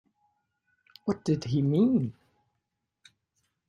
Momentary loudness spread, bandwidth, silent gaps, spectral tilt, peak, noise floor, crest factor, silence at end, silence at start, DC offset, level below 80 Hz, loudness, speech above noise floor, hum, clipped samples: 12 LU; 10.5 kHz; none; -8.5 dB/octave; -14 dBFS; -82 dBFS; 18 dB; 1.55 s; 1.05 s; under 0.1%; -66 dBFS; -28 LUFS; 57 dB; none; under 0.1%